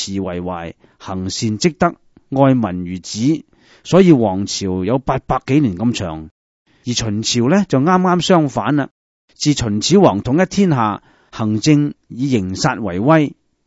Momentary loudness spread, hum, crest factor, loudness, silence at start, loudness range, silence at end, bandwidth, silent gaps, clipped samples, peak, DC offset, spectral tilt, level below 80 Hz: 13 LU; none; 16 dB; -16 LUFS; 0 s; 4 LU; 0.4 s; 8 kHz; 6.31-6.65 s, 8.91-9.28 s; under 0.1%; 0 dBFS; under 0.1%; -5.5 dB/octave; -44 dBFS